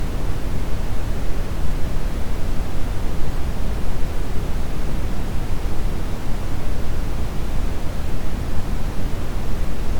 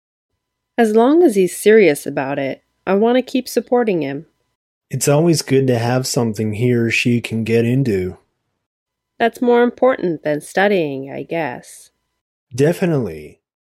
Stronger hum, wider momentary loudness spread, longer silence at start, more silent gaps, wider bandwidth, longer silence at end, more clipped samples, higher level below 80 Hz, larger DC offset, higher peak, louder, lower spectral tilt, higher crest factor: neither; second, 1 LU vs 14 LU; second, 0 s vs 0.8 s; second, none vs 4.55-4.81 s, 8.66-8.86 s, 12.21-12.47 s; second, 14 kHz vs 15.5 kHz; second, 0 s vs 0.35 s; neither; first, -22 dBFS vs -58 dBFS; neither; second, -4 dBFS vs 0 dBFS; second, -28 LUFS vs -16 LUFS; about the same, -6 dB/octave vs -5.5 dB/octave; about the same, 12 dB vs 16 dB